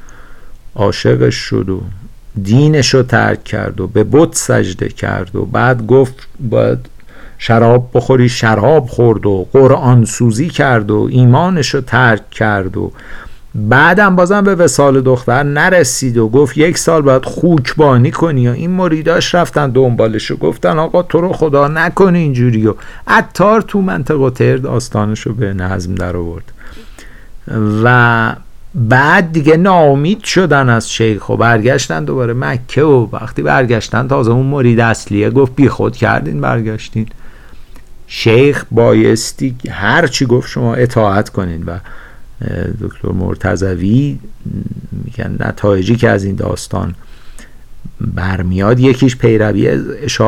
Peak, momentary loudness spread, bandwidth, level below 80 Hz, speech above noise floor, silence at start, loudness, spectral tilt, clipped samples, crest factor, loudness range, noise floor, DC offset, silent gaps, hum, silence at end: 0 dBFS; 11 LU; 14 kHz; -34 dBFS; 20 dB; 0 s; -11 LUFS; -6 dB/octave; under 0.1%; 12 dB; 6 LU; -31 dBFS; under 0.1%; none; none; 0 s